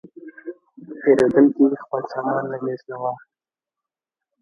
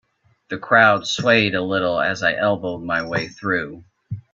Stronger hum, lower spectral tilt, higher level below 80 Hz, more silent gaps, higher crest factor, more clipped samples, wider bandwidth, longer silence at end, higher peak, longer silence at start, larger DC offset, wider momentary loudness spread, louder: neither; first, -8 dB/octave vs -4.5 dB/octave; second, -64 dBFS vs -58 dBFS; neither; about the same, 20 dB vs 20 dB; neither; first, 8.6 kHz vs 7.6 kHz; first, 1.25 s vs 0.15 s; about the same, -2 dBFS vs 0 dBFS; second, 0.25 s vs 0.5 s; neither; first, 22 LU vs 18 LU; about the same, -20 LUFS vs -19 LUFS